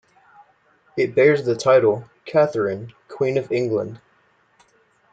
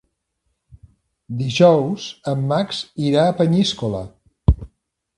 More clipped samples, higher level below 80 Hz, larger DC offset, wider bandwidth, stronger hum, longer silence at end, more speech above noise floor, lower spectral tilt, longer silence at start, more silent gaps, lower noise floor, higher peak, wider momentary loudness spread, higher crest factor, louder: neither; second, -66 dBFS vs -32 dBFS; neither; second, 9 kHz vs 11 kHz; neither; first, 1.15 s vs 0.5 s; second, 42 dB vs 55 dB; about the same, -6.5 dB/octave vs -6.5 dB/octave; second, 0.95 s vs 1.3 s; neither; second, -60 dBFS vs -73 dBFS; second, -4 dBFS vs 0 dBFS; about the same, 15 LU vs 13 LU; about the same, 18 dB vs 20 dB; about the same, -20 LUFS vs -19 LUFS